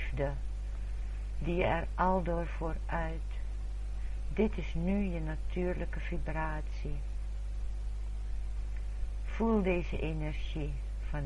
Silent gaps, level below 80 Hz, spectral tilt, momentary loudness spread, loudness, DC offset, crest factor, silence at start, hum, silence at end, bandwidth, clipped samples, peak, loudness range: none; -36 dBFS; -7.5 dB/octave; 10 LU; -36 LUFS; under 0.1%; 18 dB; 0 s; 50 Hz at -35 dBFS; 0 s; 7.8 kHz; under 0.1%; -14 dBFS; 4 LU